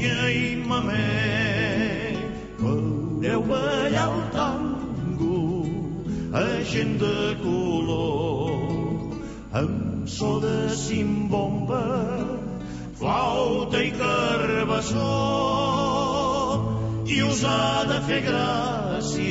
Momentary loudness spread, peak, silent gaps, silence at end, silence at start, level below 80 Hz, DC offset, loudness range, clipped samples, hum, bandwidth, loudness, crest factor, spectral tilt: 7 LU; -10 dBFS; none; 0 s; 0 s; -44 dBFS; under 0.1%; 3 LU; under 0.1%; none; 8 kHz; -25 LUFS; 14 dB; -5.5 dB/octave